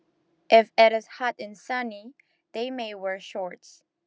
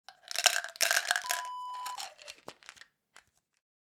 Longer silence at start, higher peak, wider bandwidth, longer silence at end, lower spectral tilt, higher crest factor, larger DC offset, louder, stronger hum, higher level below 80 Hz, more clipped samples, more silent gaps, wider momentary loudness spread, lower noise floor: first, 0.5 s vs 0.1 s; about the same, -2 dBFS vs -4 dBFS; second, 8 kHz vs over 20 kHz; second, 0.5 s vs 1.05 s; first, -3.5 dB/octave vs 3.5 dB/octave; second, 24 dB vs 30 dB; neither; first, -24 LUFS vs -30 LUFS; neither; about the same, under -90 dBFS vs -86 dBFS; neither; neither; second, 18 LU vs 22 LU; first, -69 dBFS vs -64 dBFS